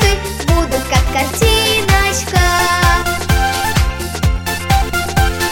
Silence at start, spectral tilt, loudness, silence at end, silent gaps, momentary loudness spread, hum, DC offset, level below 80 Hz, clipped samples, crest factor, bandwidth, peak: 0 s; -4 dB/octave; -14 LUFS; 0 s; none; 5 LU; none; under 0.1%; -20 dBFS; under 0.1%; 14 dB; 17 kHz; 0 dBFS